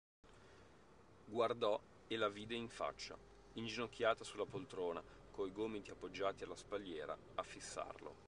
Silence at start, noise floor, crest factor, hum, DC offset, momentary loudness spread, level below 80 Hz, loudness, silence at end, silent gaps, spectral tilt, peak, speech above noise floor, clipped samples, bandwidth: 0.25 s; -66 dBFS; 24 dB; none; under 0.1%; 15 LU; -70 dBFS; -45 LUFS; 0 s; none; -4 dB/octave; -22 dBFS; 22 dB; under 0.1%; 11 kHz